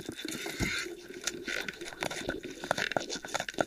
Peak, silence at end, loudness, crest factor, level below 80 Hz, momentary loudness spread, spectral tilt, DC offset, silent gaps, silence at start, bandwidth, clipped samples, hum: -10 dBFS; 0 s; -35 LUFS; 26 dB; -56 dBFS; 6 LU; -2.5 dB/octave; under 0.1%; none; 0 s; 16 kHz; under 0.1%; none